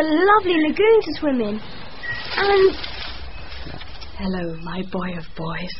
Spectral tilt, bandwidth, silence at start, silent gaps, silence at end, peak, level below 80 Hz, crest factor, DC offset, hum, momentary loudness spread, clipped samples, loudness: -3.5 dB/octave; 5.8 kHz; 0 s; none; 0 s; -4 dBFS; -40 dBFS; 18 dB; 2%; none; 20 LU; under 0.1%; -20 LUFS